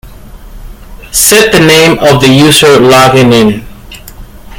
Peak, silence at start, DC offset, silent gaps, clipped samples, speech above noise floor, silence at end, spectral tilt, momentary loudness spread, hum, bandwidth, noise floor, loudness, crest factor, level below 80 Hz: 0 dBFS; 0.05 s; under 0.1%; none; 5%; 24 dB; 0.05 s; -4 dB/octave; 5 LU; none; over 20 kHz; -28 dBFS; -4 LUFS; 6 dB; -30 dBFS